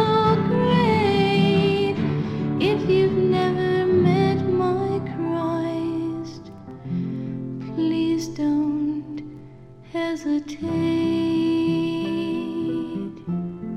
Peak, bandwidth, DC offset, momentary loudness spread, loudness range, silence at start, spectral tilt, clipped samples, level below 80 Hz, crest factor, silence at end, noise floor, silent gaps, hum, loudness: -6 dBFS; 11.5 kHz; under 0.1%; 12 LU; 6 LU; 0 s; -7.5 dB/octave; under 0.1%; -54 dBFS; 16 dB; 0 s; -43 dBFS; none; none; -22 LUFS